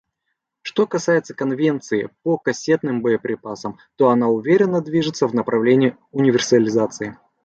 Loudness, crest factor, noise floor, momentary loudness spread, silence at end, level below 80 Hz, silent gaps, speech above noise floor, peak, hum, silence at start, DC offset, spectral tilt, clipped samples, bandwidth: -19 LUFS; 16 dB; -76 dBFS; 11 LU; 0.3 s; -62 dBFS; none; 58 dB; -2 dBFS; none; 0.65 s; under 0.1%; -5.5 dB/octave; under 0.1%; 8.2 kHz